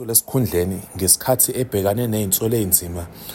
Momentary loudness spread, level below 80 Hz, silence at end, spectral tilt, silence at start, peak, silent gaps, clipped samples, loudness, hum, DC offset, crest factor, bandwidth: 7 LU; -48 dBFS; 0 s; -4 dB/octave; 0 s; 0 dBFS; none; under 0.1%; -18 LUFS; none; under 0.1%; 20 dB; 16.5 kHz